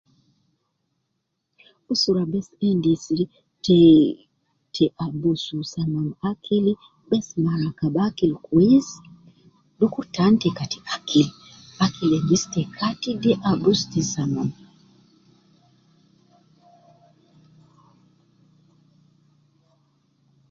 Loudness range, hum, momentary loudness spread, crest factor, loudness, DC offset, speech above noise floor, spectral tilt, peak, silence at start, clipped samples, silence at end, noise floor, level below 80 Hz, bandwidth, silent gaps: 5 LU; none; 11 LU; 20 dB; -22 LUFS; under 0.1%; 56 dB; -6 dB/octave; -4 dBFS; 1.9 s; under 0.1%; 6 s; -76 dBFS; -58 dBFS; 7.6 kHz; none